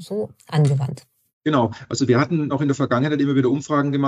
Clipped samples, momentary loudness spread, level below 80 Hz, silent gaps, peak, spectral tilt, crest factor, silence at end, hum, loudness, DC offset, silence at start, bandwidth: under 0.1%; 10 LU; -62 dBFS; 1.33-1.41 s; -4 dBFS; -7 dB/octave; 16 dB; 0 s; none; -21 LUFS; under 0.1%; 0 s; 10.5 kHz